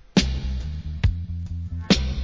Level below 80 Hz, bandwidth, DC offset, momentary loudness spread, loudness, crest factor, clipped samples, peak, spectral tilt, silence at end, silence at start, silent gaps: -28 dBFS; 7.6 kHz; under 0.1%; 10 LU; -26 LUFS; 22 dB; under 0.1%; -2 dBFS; -5.5 dB/octave; 0 s; 0.15 s; none